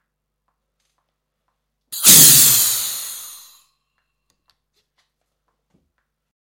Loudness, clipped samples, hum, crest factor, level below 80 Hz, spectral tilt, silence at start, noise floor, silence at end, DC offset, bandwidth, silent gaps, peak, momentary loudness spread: -9 LUFS; under 0.1%; 50 Hz at -55 dBFS; 20 dB; -54 dBFS; 0 dB/octave; 1.9 s; -74 dBFS; 3.25 s; under 0.1%; over 20 kHz; none; 0 dBFS; 25 LU